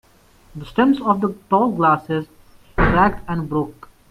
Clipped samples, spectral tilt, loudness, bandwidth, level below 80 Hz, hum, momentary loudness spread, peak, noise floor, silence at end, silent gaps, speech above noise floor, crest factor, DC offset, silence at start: under 0.1%; -8 dB/octave; -19 LUFS; 14.5 kHz; -34 dBFS; none; 15 LU; -2 dBFS; -51 dBFS; 0.4 s; none; 33 dB; 18 dB; under 0.1%; 0.55 s